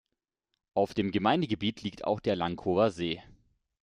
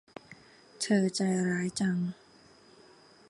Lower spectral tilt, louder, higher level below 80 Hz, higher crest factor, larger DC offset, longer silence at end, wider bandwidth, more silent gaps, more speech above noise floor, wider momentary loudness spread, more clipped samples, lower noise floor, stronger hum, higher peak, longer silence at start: first, -6.5 dB/octave vs -5 dB/octave; about the same, -30 LUFS vs -30 LUFS; first, -62 dBFS vs -72 dBFS; about the same, 20 dB vs 18 dB; neither; second, 0.6 s vs 1.15 s; about the same, 10.5 kHz vs 11.5 kHz; neither; first, 56 dB vs 29 dB; second, 8 LU vs 22 LU; neither; first, -85 dBFS vs -58 dBFS; neither; about the same, -12 dBFS vs -14 dBFS; first, 0.75 s vs 0.3 s